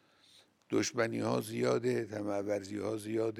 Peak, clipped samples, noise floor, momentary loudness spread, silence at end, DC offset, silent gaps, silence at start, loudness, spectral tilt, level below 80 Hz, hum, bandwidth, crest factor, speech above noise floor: -18 dBFS; under 0.1%; -65 dBFS; 5 LU; 0 s; under 0.1%; none; 0.7 s; -34 LUFS; -5 dB/octave; -80 dBFS; none; 16 kHz; 18 dB; 31 dB